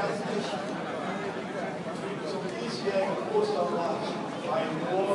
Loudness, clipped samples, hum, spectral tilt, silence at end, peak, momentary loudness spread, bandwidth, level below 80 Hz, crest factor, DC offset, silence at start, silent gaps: -31 LUFS; under 0.1%; none; -5.5 dB/octave; 0 s; -14 dBFS; 6 LU; 11.5 kHz; -74 dBFS; 16 dB; under 0.1%; 0 s; none